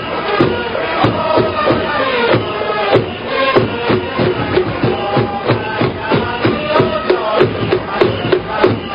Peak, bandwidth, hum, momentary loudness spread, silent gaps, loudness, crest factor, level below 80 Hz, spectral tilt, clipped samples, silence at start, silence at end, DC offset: 0 dBFS; 5.4 kHz; none; 4 LU; none; -15 LUFS; 14 dB; -38 dBFS; -8.5 dB/octave; under 0.1%; 0 s; 0 s; under 0.1%